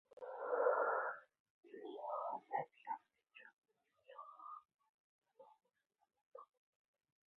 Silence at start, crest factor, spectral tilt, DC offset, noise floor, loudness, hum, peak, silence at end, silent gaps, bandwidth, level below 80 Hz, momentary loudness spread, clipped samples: 0.2 s; 24 dB; -2.5 dB/octave; under 0.1%; -66 dBFS; -42 LUFS; none; -24 dBFS; 0.9 s; 1.40-1.63 s, 3.53-3.62 s, 4.89-5.22 s, 6.21-6.31 s; 4 kHz; under -90 dBFS; 24 LU; under 0.1%